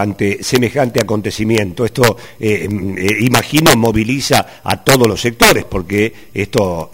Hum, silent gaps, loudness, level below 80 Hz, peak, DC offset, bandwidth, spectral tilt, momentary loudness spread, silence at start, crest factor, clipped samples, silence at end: none; none; -14 LUFS; -36 dBFS; 0 dBFS; 0.8%; over 20 kHz; -4.5 dB/octave; 8 LU; 0 s; 14 dB; 0.2%; 0.05 s